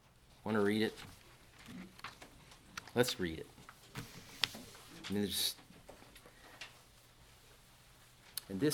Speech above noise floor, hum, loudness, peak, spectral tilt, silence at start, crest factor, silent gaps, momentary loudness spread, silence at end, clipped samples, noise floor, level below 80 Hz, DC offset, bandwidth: 26 dB; none; -38 LUFS; -8 dBFS; -4 dB/octave; 0.45 s; 34 dB; none; 26 LU; 0 s; under 0.1%; -62 dBFS; -66 dBFS; under 0.1%; 19.5 kHz